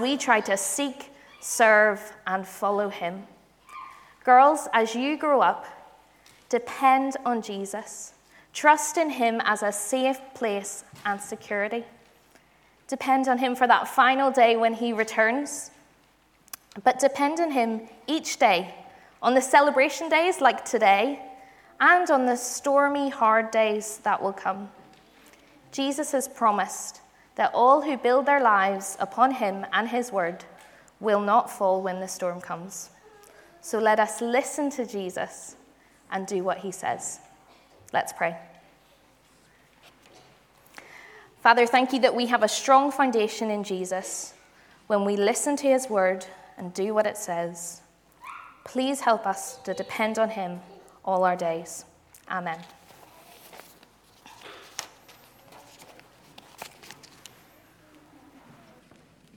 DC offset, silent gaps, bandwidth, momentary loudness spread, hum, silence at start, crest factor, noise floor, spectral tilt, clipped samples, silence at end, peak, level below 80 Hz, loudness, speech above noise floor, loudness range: under 0.1%; none; 19 kHz; 19 LU; none; 0 s; 22 dB; -61 dBFS; -3 dB/octave; under 0.1%; 2.45 s; -4 dBFS; -72 dBFS; -24 LUFS; 38 dB; 10 LU